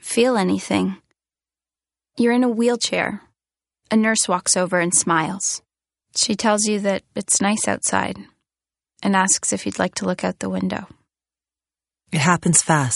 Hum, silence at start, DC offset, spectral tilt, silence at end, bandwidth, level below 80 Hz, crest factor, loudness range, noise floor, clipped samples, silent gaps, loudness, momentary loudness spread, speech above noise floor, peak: none; 0.05 s; under 0.1%; -3.5 dB/octave; 0 s; 11.5 kHz; -60 dBFS; 20 dB; 4 LU; under -90 dBFS; under 0.1%; none; -19 LUFS; 10 LU; over 70 dB; 0 dBFS